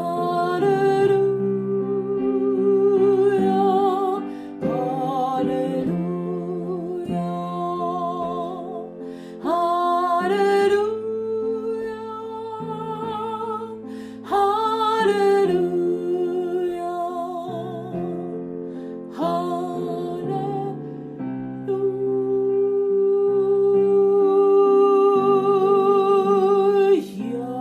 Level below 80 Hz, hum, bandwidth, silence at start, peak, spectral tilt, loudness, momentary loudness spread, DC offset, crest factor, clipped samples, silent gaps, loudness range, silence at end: -62 dBFS; none; 9.4 kHz; 0 s; -8 dBFS; -7.5 dB/octave; -21 LUFS; 13 LU; under 0.1%; 14 dB; under 0.1%; none; 10 LU; 0 s